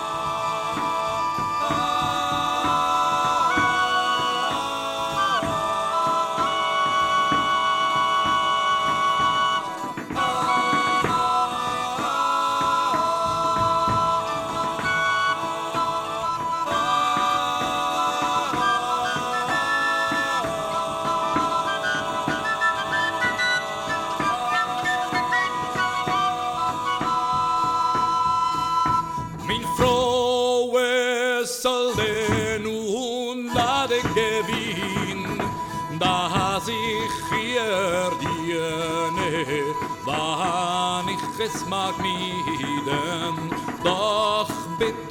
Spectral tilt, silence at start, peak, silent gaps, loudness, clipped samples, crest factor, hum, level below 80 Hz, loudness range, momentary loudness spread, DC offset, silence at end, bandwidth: -3.5 dB/octave; 0 s; -6 dBFS; none; -23 LUFS; under 0.1%; 18 dB; none; -50 dBFS; 3 LU; 6 LU; under 0.1%; 0 s; 18.5 kHz